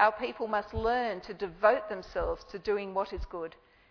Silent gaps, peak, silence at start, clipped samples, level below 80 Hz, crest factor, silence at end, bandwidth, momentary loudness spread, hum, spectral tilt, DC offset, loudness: none; -12 dBFS; 0 s; under 0.1%; -48 dBFS; 20 dB; 0.4 s; 5.4 kHz; 12 LU; none; -6 dB/octave; under 0.1%; -32 LUFS